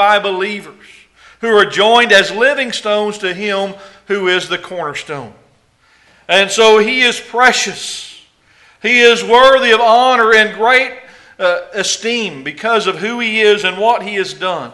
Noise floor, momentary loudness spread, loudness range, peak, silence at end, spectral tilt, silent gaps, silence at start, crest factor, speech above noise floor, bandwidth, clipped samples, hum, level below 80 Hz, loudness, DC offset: -53 dBFS; 14 LU; 7 LU; 0 dBFS; 0 s; -2 dB/octave; none; 0 s; 14 dB; 40 dB; 12 kHz; 0.1%; none; -54 dBFS; -12 LUFS; under 0.1%